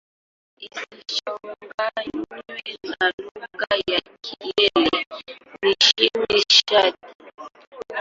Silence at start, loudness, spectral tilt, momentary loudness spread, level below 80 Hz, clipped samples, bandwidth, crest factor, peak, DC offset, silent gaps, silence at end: 0.6 s; -19 LUFS; -1.5 dB/octave; 21 LU; -60 dBFS; under 0.1%; 7.8 kHz; 22 dB; 0 dBFS; under 0.1%; 1.74-1.78 s, 3.14-3.18 s, 3.31-3.35 s, 5.07-5.11 s, 7.15-7.19 s, 7.34-7.38 s, 7.67-7.72 s; 0 s